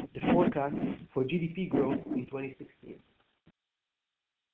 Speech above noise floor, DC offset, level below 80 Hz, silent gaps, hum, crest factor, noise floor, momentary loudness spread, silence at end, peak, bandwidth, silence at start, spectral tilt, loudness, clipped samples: 55 dB; under 0.1%; -60 dBFS; none; none; 18 dB; -88 dBFS; 22 LU; 1.55 s; -14 dBFS; 4.1 kHz; 0 s; -10 dB/octave; -31 LUFS; under 0.1%